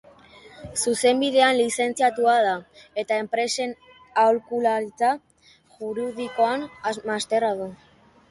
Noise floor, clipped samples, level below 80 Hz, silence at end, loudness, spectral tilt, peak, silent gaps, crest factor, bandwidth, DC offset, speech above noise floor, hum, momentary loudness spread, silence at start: -56 dBFS; under 0.1%; -64 dBFS; 0.55 s; -23 LUFS; -2.5 dB/octave; -4 dBFS; none; 20 dB; 11.5 kHz; under 0.1%; 34 dB; none; 13 LU; 0.45 s